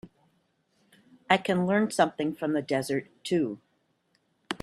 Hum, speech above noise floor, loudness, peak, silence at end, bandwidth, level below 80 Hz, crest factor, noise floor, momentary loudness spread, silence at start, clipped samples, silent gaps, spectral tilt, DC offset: none; 45 dB; -28 LUFS; -4 dBFS; 0.05 s; 13.5 kHz; -70 dBFS; 26 dB; -72 dBFS; 9 LU; 0.05 s; under 0.1%; none; -5.5 dB/octave; under 0.1%